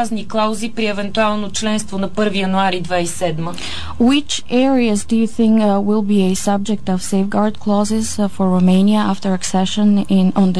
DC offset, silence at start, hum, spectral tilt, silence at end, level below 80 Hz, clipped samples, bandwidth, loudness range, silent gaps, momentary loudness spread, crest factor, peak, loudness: 6%; 0 s; none; -5.5 dB/octave; 0 s; -44 dBFS; under 0.1%; 11 kHz; 3 LU; none; 7 LU; 12 dB; -4 dBFS; -16 LUFS